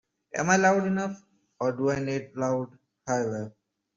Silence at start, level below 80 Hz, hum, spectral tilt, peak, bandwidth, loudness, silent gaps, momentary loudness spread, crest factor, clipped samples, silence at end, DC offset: 0.35 s; -64 dBFS; none; -5.5 dB/octave; -8 dBFS; 7.6 kHz; -27 LUFS; none; 18 LU; 22 dB; under 0.1%; 0.45 s; under 0.1%